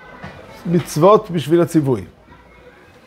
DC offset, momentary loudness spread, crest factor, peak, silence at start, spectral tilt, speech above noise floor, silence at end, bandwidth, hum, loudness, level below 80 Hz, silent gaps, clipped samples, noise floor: under 0.1%; 23 LU; 18 dB; 0 dBFS; 0.1 s; -7 dB/octave; 30 dB; 1 s; 16 kHz; none; -16 LUFS; -50 dBFS; none; under 0.1%; -45 dBFS